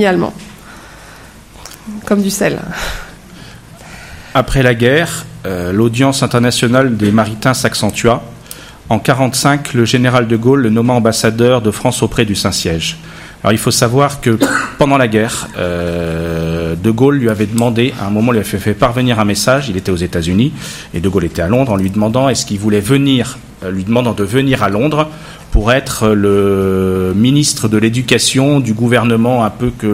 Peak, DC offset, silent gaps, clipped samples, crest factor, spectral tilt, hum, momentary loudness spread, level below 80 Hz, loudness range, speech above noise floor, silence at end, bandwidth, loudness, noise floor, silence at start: 0 dBFS; under 0.1%; none; 0.1%; 12 dB; -5 dB/octave; none; 11 LU; -32 dBFS; 4 LU; 24 dB; 0 s; 16.5 kHz; -13 LUFS; -36 dBFS; 0 s